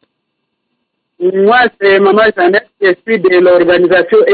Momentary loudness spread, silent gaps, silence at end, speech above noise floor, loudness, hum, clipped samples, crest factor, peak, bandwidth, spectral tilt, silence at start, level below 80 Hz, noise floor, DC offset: 6 LU; none; 0 s; 61 dB; -9 LUFS; none; under 0.1%; 8 dB; 0 dBFS; 4.7 kHz; -11 dB/octave; 1.2 s; -52 dBFS; -69 dBFS; under 0.1%